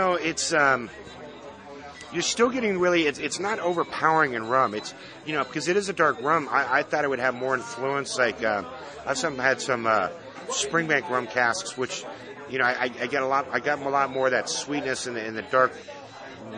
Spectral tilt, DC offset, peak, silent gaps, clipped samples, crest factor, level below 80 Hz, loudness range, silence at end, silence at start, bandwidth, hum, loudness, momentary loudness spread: -3 dB/octave; under 0.1%; -6 dBFS; none; under 0.1%; 20 dB; -64 dBFS; 2 LU; 0 s; 0 s; 10.5 kHz; none; -25 LUFS; 17 LU